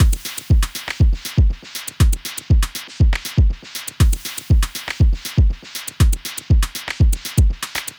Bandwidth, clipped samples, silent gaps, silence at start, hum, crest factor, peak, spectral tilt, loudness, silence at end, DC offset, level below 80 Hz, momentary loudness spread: over 20 kHz; under 0.1%; none; 0 s; none; 14 dB; -4 dBFS; -4.5 dB/octave; -20 LUFS; 0.1 s; under 0.1%; -18 dBFS; 7 LU